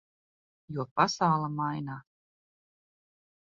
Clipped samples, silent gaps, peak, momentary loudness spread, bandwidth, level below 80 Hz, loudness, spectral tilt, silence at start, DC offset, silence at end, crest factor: under 0.1%; 0.91-0.96 s; -10 dBFS; 15 LU; 7.4 kHz; -70 dBFS; -30 LUFS; -4.5 dB/octave; 0.7 s; under 0.1%; 1.4 s; 24 dB